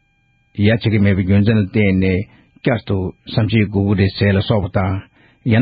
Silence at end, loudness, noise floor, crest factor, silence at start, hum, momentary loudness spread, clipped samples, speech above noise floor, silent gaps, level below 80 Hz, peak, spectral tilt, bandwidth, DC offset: 0 s; -17 LUFS; -60 dBFS; 14 dB; 0.55 s; none; 8 LU; under 0.1%; 44 dB; none; -42 dBFS; -2 dBFS; -6.5 dB/octave; 5 kHz; under 0.1%